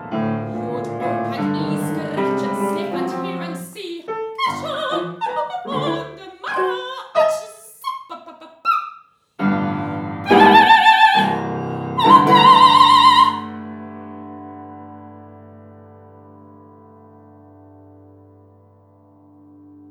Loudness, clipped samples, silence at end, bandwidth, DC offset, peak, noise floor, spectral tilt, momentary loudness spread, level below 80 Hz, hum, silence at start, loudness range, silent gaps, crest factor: -16 LUFS; under 0.1%; 4.4 s; 15.5 kHz; under 0.1%; 0 dBFS; -50 dBFS; -5 dB/octave; 25 LU; -64 dBFS; none; 0 s; 13 LU; none; 18 dB